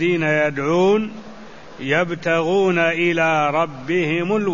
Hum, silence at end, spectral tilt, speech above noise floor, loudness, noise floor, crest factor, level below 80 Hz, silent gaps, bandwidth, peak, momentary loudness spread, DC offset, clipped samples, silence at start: none; 0 s; -6 dB/octave; 21 dB; -18 LUFS; -39 dBFS; 14 dB; -56 dBFS; none; 7.4 kHz; -4 dBFS; 6 LU; 0.8%; under 0.1%; 0 s